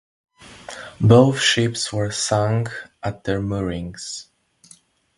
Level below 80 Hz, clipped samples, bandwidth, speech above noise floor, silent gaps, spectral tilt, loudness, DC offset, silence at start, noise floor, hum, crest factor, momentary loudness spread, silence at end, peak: -46 dBFS; under 0.1%; 11.5 kHz; 33 dB; none; -5 dB/octave; -20 LUFS; under 0.1%; 0.45 s; -53 dBFS; none; 20 dB; 21 LU; 0.95 s; 0 dBFS